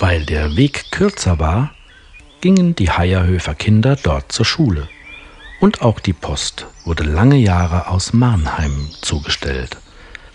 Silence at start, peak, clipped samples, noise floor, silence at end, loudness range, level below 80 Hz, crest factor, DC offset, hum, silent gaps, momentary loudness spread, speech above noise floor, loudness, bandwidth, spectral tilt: 0 s; 0 dBFS; under 0.1%; -42 dBFS; 0.2 s; 1 LU; -28 dBFS; 16 dB; under 0.1%; none; none; 11 LU; 27 dB; -16 LUFS; 10.5 kHz; -6 dB/octave